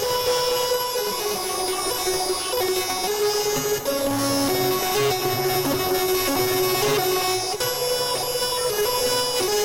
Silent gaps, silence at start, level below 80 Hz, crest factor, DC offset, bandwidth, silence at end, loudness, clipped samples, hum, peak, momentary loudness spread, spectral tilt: none; 0 s; -50 dBFS; 10 dB; under 0.1%; 16 kHz; 0 s; -22 LUFS; under 0.1%; none; -12 dBFS; 3 LU; -2.5 dB/octave